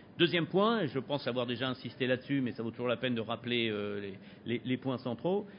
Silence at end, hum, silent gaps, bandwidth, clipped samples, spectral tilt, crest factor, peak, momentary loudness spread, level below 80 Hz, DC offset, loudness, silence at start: 0 s; none; none; 5.2 kHz; under 0.1%; -4 dB/octave; 22 dB; -12 dBFS; 9 LU; -70 dBFS; under 0.1%; -33 LUFS; 0 s